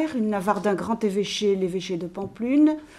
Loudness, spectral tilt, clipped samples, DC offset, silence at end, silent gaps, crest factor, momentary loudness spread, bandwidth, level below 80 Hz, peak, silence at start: -24 LUFS; -5.5 dB/octave; under 0.1%; under 0.1%; 0 s; none; 16 dB; 10 LU; 13 kHz; -58 dBFS; -6 dBFS; 0 s